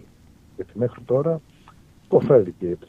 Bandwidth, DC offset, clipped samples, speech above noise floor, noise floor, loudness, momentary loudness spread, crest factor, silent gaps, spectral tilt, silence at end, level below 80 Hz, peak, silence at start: 6.8 kHz; under 0.1%; under 0.1%; 31 dB; -51 dBFS; -21 LUFS; 15 LU; 20 dB; none; -10 dB/octave; 0.15 s; -56 dBFS; -2 dBFS; 0.6 s